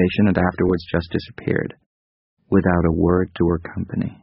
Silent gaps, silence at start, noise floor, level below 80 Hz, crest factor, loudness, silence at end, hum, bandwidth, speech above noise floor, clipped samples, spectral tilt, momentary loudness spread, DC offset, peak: 1.86-2.37 s; 0 s; under -90 dBFS; -40 dBFS; 18 dB; -20 LUFS; 0.1 s; none; 5.8 kHz; over 70 dB; under 0.1%; -7 dB/octave; 9 LU; under 0.1%; -2 dBFS